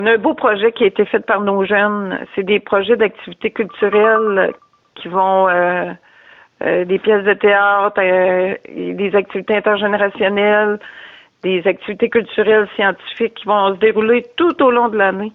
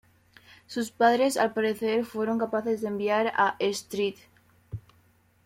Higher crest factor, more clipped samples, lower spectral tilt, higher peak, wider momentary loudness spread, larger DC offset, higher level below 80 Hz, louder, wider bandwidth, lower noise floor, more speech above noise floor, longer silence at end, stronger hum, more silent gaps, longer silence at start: second, 12 dB vs 18 dB; neither; first, -8 dB/octave vs -4.5 dB/octave; first, -2 dBFS vs -10 dBFS; second, 9 LU vs 14 LU; neither; first, -58 dBFS vs -66 dBFS; first, -15 LUFS vs -27 LUFS; second, 4.1 kHz vs 16.5 kHz; second, -46 dBFS vs -63 dBFS; second, 31 dB vs 37 dB; second, 0.05 s vs 0.65 s; neither; neither; second, 0 s vs 0.7 s